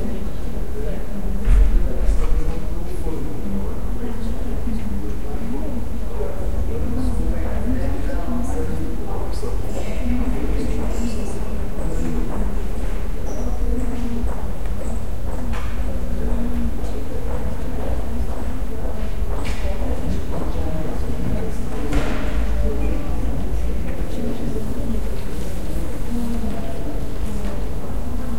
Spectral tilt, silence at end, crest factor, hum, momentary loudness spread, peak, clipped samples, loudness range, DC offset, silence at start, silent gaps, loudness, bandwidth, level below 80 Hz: -7 dB/octave; 0 s; 18 dB; none; 5 LU; -2 dBFS; under 0.1%; 3 LU; 10%; 0 s; none; -26 LUFS; 16.5 kHz; -24 dBFS